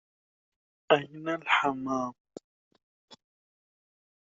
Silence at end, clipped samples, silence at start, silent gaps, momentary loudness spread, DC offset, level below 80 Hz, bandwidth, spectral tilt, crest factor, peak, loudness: 1.05 s; under 0.1%; 0.9 s; 2.20-2.25 s, 2.44-2.71 s, 2.83-3.08 s; 9 LU; under 0.1%; -74 dBFS; 7.6 kHz; -2 dB/octave; 26 dB; -8 dBFS; -29 LUFS